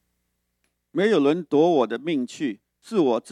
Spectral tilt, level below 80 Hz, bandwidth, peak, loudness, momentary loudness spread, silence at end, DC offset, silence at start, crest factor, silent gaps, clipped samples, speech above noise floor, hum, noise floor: -6 dB/octave; -80 dBFS; 11 kHz; -8 dBFS; -23 LUFS; 11 LU; 0 s; under 0.1%; 0.95 s; 16 dB; none; under 0.1%; 54 dB; 60 Hz at -50 dBFS; -75 dBFS